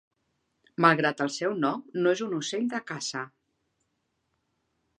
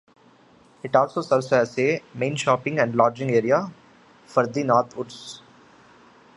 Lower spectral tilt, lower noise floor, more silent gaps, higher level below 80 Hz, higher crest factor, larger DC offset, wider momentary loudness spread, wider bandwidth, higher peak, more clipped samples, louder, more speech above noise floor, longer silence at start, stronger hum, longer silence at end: about the same, -4.5 dB/octave vs -5.5 dB/octave; first, -78 dBFS vs -54 dBFS; neither; second, -80 dBFS vs -68 dBFS; first, 26 dB vs 20 dB; neither; second, 12 LU vs 16 LU; about the same, 11 kHz vs 11.5 kHz; about the same, -4 dBFS vs -4 dBFS; neither; second, -27 LUFS vs -22 LUFS; first, 50 dB vs 32 dB; about the same, 0.8 s vs 0.85 s; neither; first, 1.7 s vs 1 s